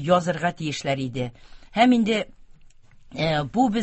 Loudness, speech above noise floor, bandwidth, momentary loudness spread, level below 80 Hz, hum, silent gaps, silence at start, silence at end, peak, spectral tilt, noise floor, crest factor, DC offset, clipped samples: -23 LUFS; 26 dB; 8.4 kHz; 14 LU; -52 dBFS; none; none; 0 s; 0 s; -4 dBFS; -6 dB/octave; -49 dBFS; 20 dB; under 0.1%; under 0.1%